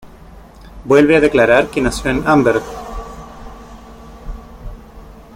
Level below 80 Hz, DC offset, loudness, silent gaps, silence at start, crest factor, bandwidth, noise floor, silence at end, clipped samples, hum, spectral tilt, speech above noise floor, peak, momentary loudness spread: -34 dBFS; under 0.1%; -13 LUFS; none; 0.05 s; 16 dB; 16 kHz; -39 dBFS; 0.25 s; under 0.1%; none; -6 dB/octave; 26 dB; 0 dBFS; 25 LU